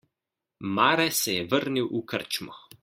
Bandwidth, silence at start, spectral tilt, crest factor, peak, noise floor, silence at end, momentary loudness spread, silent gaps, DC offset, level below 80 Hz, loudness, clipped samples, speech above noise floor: 16.5 kHz; 0.6 s; -3 dB/octave; 22 dB; -6 dBFS; -87 dBFS; 0.25 s; 11 LU; none; under 0.1%; -68 dBFS; -26 LUFS; under 0.1%; 61 dB